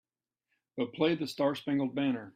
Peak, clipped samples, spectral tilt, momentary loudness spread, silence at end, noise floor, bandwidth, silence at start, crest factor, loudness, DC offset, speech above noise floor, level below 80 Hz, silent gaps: -16 dBFS; under 0.1%; -6.5 dB/octave; 7 LU; 0.05 s; -84 dBFS; 13.5 kHz; 0.75 s; 18 dB; -32 LUFS; under 0.1%; 53 dB; -76 dBFS; none